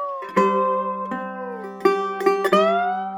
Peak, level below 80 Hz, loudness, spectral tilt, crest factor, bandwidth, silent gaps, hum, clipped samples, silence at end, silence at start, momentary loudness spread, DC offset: -2 dBFS; -68 dBFS; -21 LUFS; -6 dB/octave; 18 dB; 16 kHz; none; none; under 0.1%; 0 s; 0 s; 12 LU; under 0.1%